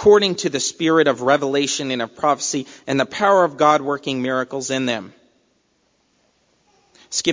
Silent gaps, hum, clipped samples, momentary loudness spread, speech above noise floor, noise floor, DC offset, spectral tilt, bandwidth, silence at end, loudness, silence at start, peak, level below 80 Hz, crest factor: none; none; under 0.1%; 8 LU; 46 dB; -64 dBFS; under 0.1%; -3.5 dB/octave; 7.6 kHz; 0 s; -19 LUFS; 0 s; -2 dBFS; -58 dBFS; 18 dB